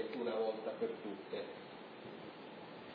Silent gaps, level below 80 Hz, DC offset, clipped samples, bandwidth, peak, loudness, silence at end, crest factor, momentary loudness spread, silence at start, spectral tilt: none; -88 dBFS; under 0.1%; under 0.1%; 5 kHz; -26 dBFS; -44 LUFS; 0 s; 18 dB; 13 LU; 0 s; -3.5 dB/octave